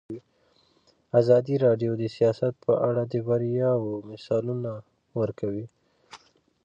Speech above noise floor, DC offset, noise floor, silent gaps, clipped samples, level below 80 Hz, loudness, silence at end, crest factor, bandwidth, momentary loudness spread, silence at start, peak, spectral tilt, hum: 40 dB; under 0.1%; -65 dBFS; none; under 0.1%; -66 dBFS; -26 LUFS; 0.5 s; 18 dB; 7.6 kHz; 16 LU; 0.1 s; -8 dBFS; -9 dB/octave; none